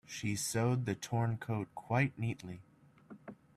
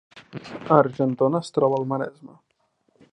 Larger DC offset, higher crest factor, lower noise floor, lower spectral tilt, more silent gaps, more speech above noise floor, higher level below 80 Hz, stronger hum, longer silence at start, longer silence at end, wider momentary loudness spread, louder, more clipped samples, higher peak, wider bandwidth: neither; about the same, 20 dB vs 22 dB; second, -57 dBFS vs -69 dBFS; second, -5.5 dB/octave vs -8 dB/octave; neither; second, 22 dB vs 46 dB; about the same, -68 dBFS vs -68 dBFS; neither; about the same, 0.1 s vs 0.15 s; second, 0.2 s vs 0.85 s; about the same, 19 LU vs 19 LU; second, -36 LUFS vs -22 LUFS; neither; second, -18 dBFS vs -2 dBFS; first, 14 kHz vs 10.5 kHz